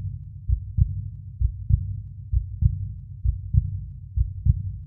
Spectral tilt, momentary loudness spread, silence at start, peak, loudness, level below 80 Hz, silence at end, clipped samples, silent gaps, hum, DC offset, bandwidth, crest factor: -15 dB/octave; 11 LU; 0 s; -6 dBFS; -27 LUFS; -28 dBFS; 0 s; under 0.1%; none; none; under 0.1%; 0.4 kHz; 20 dB